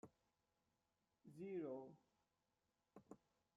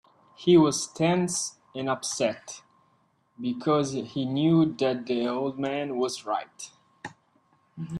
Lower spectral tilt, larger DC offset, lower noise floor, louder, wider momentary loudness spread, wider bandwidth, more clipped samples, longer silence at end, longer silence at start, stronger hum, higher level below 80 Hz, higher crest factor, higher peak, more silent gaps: first, -8.5 dB/octave vs -5 dB/octave; neither; first, -90 dBFS vs -67 dBFS; second, -53 LUFS vs -26 LUFS; second, 18 LU vs 21 LU; second, 7.4 kHz vs 13 kHz; neither; first, 0.4 s vs 0 s; second, 0.05 s vs 0.4 s; neither; second, under -90 dBFS vs -68 dBFS; about the same, 18 dB vs 18 dB; second, -40 dBFS vs -10 dBFS; neither